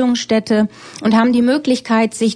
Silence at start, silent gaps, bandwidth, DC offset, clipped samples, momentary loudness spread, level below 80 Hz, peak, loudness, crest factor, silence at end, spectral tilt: 0 s; none; 10 kHz; under 0.1%; under 0.1%; 5 LU; -54 dBFS; -2 dBFS; -15 LUFS; 14 dB; 0 s; -5 dB/octave